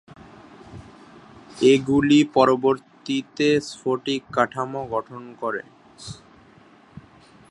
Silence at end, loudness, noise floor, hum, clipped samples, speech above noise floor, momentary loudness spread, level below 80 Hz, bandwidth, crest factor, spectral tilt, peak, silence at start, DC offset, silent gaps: 0.5 s; -21 LUFS; -51 dBFS; none; under 0.1%; 31 dB; 26 LU; -58 dBFS; 11 kHz; 22 dB; -5.5 dB/octave; -2 dBFS; 0.7 s; under 0.1%; none